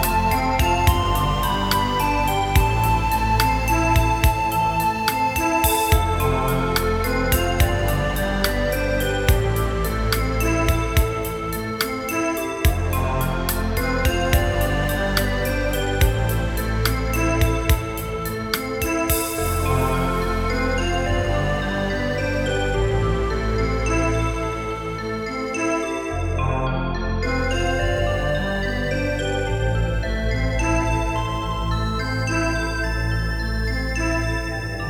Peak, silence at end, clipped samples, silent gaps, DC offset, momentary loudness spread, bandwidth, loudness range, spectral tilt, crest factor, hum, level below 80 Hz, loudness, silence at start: -2 dBFS; 0 s; under 0.1%; none; under 0.1%; 5 LU; 17.5 kHz; 4 LU; -5 dB/octave; 18 dB; none; -26 dBFS; -22 LUFS; 0 s